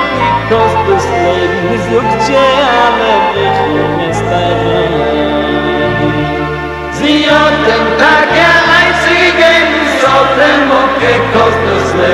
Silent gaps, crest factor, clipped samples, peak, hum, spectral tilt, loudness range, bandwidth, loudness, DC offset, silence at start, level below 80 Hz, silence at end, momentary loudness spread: none; 10 dB; 0.3%; 0 dBFS; none; -5 dB/octave; 5 LU; 15 kHz; -9 LUFS; 0.2%; 0 s; -32 dBFS; 0 s; 6 LU